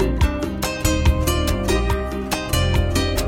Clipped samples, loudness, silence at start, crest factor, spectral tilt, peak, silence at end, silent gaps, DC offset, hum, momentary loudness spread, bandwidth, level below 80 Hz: under 0.1%; -21 LUFS; 0 s; 16 dB; -5 dB/octave; -4 dBFS; 0 s; none; under 0.1%; none; 5 LU; 17 kHz; -24 dBFS